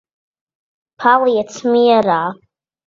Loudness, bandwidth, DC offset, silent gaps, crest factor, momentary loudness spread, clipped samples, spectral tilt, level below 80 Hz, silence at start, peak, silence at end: -14 LUFS; 7.6 kHz; under 0.1%; none; 16 dB; 7 LU; under 0.1%; -5 dB/octave; -62 dBFS; 1 s; 0 dBFS; 0.5 s